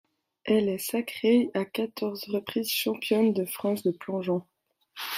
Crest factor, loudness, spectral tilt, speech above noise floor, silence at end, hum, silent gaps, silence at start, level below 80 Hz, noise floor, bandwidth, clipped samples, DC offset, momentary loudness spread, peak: 16 dB; -28 LUFS; -5 dB/octave; 20 dB; 0 s; none; none; 0.45 s; -72 dBFS; -47 dBFS; 16 kHz; under 0.1%; under 0.1%; 8 LU; -12 dBFS